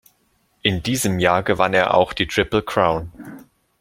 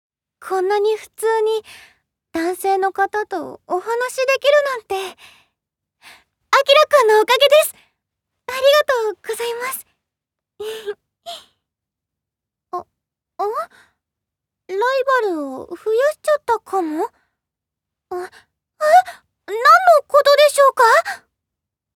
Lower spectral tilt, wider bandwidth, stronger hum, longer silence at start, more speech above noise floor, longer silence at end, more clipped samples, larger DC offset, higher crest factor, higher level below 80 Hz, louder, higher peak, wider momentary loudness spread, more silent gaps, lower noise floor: first, -4.5 dB/octave vs -1 dB/octave; about the same, 17 kHz vs 18.5 kHz; neither; first, 0.65 s vs 0.4 s; second, 45 dB vs 68 dB; second, 0.4 s vs 0.8 s; neither; neither; about the same, 20 dB vs 18 dB; first, -44 dBFS vs -68 dBFS; second, -19 LUFS vs -16 LUFS; about the same, 0 dBFS vs 0 dBFS; second, 11 LU vs 19 LU; neither; second, -64 dBFS vs -84 dBFS